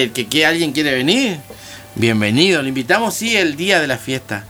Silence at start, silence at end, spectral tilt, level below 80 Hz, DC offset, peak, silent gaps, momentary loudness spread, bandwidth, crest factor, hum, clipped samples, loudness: 0 s; 0 s; -4 dB/octave; -52 dBFS; under 0.1%; 0 dBFS; none; 9 LU; over 20 kHz; 16 dB; none; under 0.1%; -15 LUFS